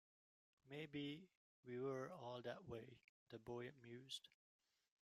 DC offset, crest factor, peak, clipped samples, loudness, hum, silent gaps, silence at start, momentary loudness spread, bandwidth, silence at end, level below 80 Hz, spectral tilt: under 0.1%; 16 dB; -38 dBFS; under 0.1%; -54 LUFS; none; 1.35-1.63 s, 3.04-3.27 s; 0.65 s; 11 LU; 14.5 kHz; 0.75 s; -86 dBFS; -5.5 dB/octave